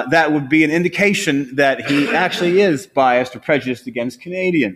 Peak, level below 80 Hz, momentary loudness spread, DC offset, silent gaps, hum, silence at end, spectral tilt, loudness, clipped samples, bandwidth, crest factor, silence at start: -2 dBFS; -58 dBFS; 8 LU; under 0.1%; none; none; 0 s; -5 dB/octave; -16 LUFS; under 0.1%; 15 kHz; 16 dB; 0 s